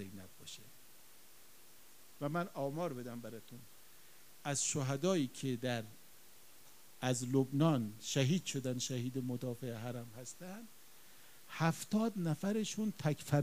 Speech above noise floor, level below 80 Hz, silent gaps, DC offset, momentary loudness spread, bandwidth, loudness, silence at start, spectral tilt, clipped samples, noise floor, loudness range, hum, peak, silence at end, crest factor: 25 dB; -76 dBFS; none; 0.1%; 24 LU; 15.5 kHz; -38 LUFS; 0 s; -5 dB/octave; under 0.1%; -62 dBFS; 8 LU; none; -16 dBFS; 0 s; 22 dB